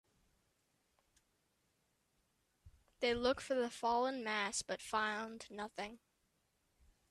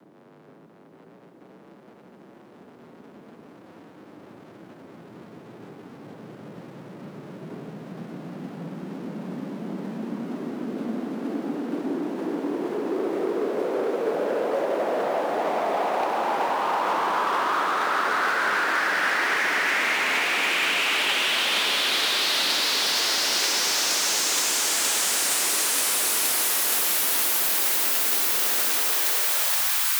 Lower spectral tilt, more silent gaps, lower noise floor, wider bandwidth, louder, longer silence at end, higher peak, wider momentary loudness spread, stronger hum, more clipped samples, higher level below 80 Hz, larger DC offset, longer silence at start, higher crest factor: first, -2.5 dB/octave vs -1 dB/octave; neither; first, -81 dBFS vs -52 dBFS; second, 13.5 kHz vs over 20 kHz; second, -39 LUFS vs -22 LUFS; first, 1.15 s vs 0 s; second, -22 dBFS vs -10 dBFS; second, 12 LU vs 18 LU; neither; neither; first, -70 dBFS vs -80 dBFS; neither; first, 2.65 s vs 1.4 s; first, 22 dB vs 16 dB